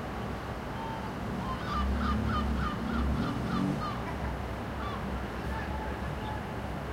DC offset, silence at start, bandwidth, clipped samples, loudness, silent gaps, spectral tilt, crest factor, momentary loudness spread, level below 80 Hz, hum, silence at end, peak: under 0.1%; 0 s; 16 kHz; under 0.1%; -34 LUFS; none; -7 dB/octave; 14 dB; 6 LU; -38 dBFS; none; 0 s; -18 dBFS